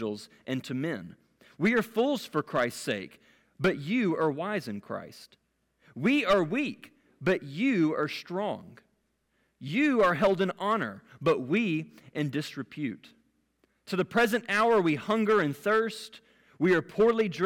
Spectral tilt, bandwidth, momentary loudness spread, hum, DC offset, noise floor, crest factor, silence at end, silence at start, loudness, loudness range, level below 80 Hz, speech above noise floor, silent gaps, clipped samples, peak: -6 dB/octave; 17.5 kHz; 14 LU; none; under 0.1%; -74 dBFS; 12 dB; 0 s; 0 s; -28 LUFS; 4 LU; -66 dBFS; 46 dB; none; under 0.1%; -16 dBFS